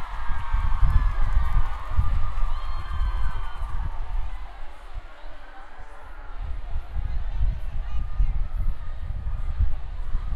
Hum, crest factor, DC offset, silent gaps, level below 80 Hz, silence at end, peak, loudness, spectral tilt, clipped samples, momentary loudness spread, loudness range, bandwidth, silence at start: none; 16 dB; under 0.1%; none; -26 dBFS; 0 s; -6 dBFS; -31 LUFS; -7 dB/octave; under 0.1%; 17 LU; 10 LU; 4.5 kHz; 0 s